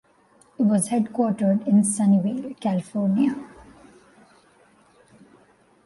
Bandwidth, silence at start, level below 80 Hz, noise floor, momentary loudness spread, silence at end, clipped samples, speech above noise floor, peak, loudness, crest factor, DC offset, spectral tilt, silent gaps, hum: 11.5 kHz; 0.6 s; -64 dBFS; -58 dBFS; 9 LU; 2.4 s; under 0.1%; 37 dB; -10 dBFS; -22 LUFS; 14 dB; under 0.1%; -6.5 dB/octave; none; none